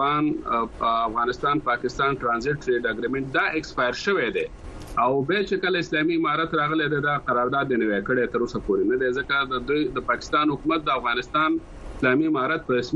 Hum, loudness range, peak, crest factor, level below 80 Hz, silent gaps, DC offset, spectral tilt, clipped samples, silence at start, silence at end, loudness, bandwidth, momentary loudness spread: none; 1 LU; -8 dBFS; 14 dB; -46 dBFS; none; under 0.1%; -5.5 dB/octave; under 0.1%; 0 s; 0 s; -24 LUFS; 9 kHz; 3 LU